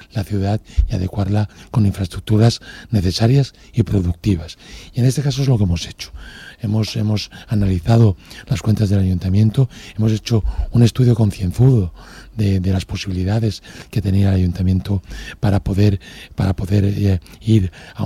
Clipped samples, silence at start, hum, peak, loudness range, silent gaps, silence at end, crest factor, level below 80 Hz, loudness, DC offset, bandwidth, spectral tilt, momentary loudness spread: under 0.1%; 0.15 s; none; -2 dBFS; 3 LU; none; 0 s; 16 dB; -32 dBFS; -18 LUFS; under 0.1%; 13.5 kHz; -7 dB/octave; 11 LU